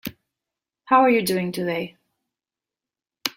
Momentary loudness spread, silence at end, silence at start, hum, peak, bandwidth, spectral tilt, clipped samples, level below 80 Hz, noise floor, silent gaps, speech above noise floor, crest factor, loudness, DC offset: 17 LU; 0.05 s; 0.05 s; none; -2 dBFS; 16.5 kHz; -4.5 dB/octave; under 0.1%; -66 dBFS; -90 dBFS; none; 70 dB; 24 dB; -21 LUFS; under 0.1%